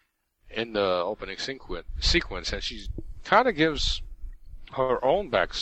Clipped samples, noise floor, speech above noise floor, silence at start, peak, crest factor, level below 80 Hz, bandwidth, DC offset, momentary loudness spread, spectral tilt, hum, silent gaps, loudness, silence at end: under 0.1%; -58 dBFS; 32 dB; 0.45 s; -6 dBFS; 22 dB; -38 dBFS; 8.6 kHz; under 0.1%; 16 LU; -4 dB/octave; none; none; -26 LUFS; 0 s